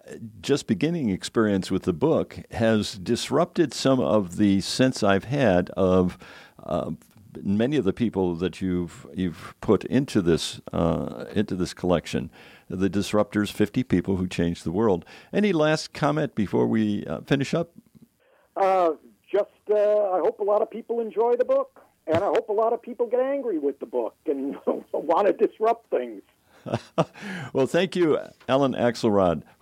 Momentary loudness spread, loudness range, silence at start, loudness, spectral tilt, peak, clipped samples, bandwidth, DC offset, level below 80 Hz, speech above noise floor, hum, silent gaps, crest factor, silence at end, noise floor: 9 LU; 3 LU; 0.05 s; -24 LUFS; -6 dB/octave; -6 dBFS; under 0.1%; 16 kHz; under 0.1%; -54 dBFS; 39 dB; none; none; 18 dB; 0.2 s; -63 dBFS